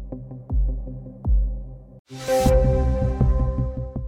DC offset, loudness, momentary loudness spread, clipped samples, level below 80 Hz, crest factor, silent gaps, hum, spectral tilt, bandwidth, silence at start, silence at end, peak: under 0.1%; -23 LUFS; 18 LU; under 0.1%; -24 dBFS; 16 dB; 1.99-2.05 s; none; -7.5 dB/octave; 16 kHz; 0 s; 0 s; -6 dBFS